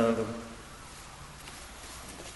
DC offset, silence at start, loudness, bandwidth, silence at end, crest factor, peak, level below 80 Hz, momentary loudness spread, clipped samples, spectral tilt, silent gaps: under 0.1%; 0 s; -39 LUFS; 11.5 kHz; 0 s; 24 dB; -12 dBFS; -54 dBFS; 13 LU; under 0.1%; -5 dB/octave; none